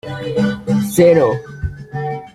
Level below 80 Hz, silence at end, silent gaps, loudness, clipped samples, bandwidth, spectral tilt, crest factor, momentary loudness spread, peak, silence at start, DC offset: -38 dBFS; 0.05 s; none; -16 LUFS; under 0.1%; 15.5 kHz; -6.5 dB/octave; 14 dB; 15 LU; -2 dBFS; 0.05 s; under 0.1%